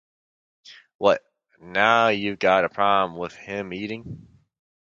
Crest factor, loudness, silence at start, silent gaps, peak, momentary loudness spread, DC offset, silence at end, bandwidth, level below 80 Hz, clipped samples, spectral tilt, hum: 22 dB; -22 LUFS; 0.7 s; 0.95-0.99 s; -2 dBFS; 15 LU; under 0.1%; 0.75 s; 7.6 kHz; -60 dBFS; under 0.1%; -5 dB/octave; none